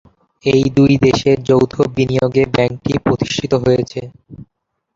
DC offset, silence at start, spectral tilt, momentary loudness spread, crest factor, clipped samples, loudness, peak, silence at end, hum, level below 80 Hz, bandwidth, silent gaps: under 0.1%; 0.45 s; -6.5 dB/octave; 7 LU; 14 dB; under 0.1%; -15 LUFS; -2 dBFS; 0.5 s; none; -42 dBFS; 7.6 kHz; none